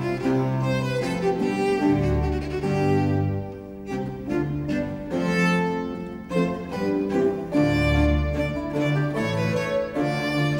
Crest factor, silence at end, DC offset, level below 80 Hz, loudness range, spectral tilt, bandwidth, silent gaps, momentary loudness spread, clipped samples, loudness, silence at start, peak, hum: 14 dB; 0 s; under 0.1%; -36 dBFS; 3 LU; -7 dB/octave; 16.5 kHz; none; 7 LU; under 0.1%; -24 LUFS; 0 s; -10 dBFS; none